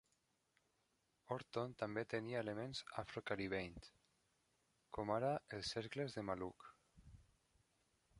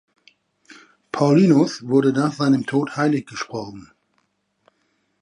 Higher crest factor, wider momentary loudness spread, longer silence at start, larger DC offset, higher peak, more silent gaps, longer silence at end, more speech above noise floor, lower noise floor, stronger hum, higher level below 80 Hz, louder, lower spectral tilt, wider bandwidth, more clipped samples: about the same, 22 dB vs 18 dB; second, 11 LU vs 15 LU; first, 1.3 s vs 1.15 s; neither; second, -26 dBFS vs -4 dBFS; neither; second, 0 s vs 1.4 s; second, 38 dB vs 50 dB; first, -84 dBFS vs -68 dBFS; neither; second, -72 dBFS vs -66 dBFS; second, -46 LUFS vs -19 LUFS; second, -5.5 dB/octave vs -7 dB/octave; about the same, 11.5 kHz vs 11 kHz; neither